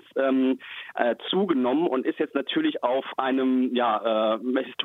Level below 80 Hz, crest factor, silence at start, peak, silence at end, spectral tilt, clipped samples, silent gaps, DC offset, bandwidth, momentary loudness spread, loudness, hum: -80 dBFS; 18 dB; 0.15 s; -8 dBFS; 0 s; -7 dB/octave; under 0.1%; none; under 0.1%; 4.1 kHz; 4 LU; -25 LUFS; none